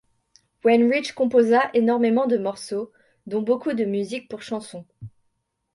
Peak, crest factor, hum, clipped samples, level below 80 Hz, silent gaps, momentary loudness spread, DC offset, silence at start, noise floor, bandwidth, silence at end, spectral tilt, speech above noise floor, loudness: -6 dBFS; 16 dB; none; under 0.1%; -68 dBFS; none; 14 LU; under 0.1%; 0.65 s; -73 dBFS; 11.5 kHz; 0.65 s; -5.5 dB/octave; 51 dB; -22 LUFS